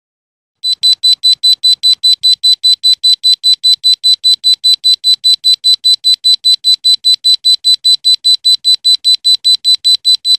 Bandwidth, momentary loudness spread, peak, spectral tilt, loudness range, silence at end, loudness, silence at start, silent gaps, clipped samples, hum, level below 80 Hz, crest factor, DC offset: 13 kHz; 1 LU; 0 dBFS; 6 dB/octave; 0 LU; 0 s; -6 LUFS; 0.65 s; none; under 0.1%; none; -70 dBFS; 10 dB; under 0.1%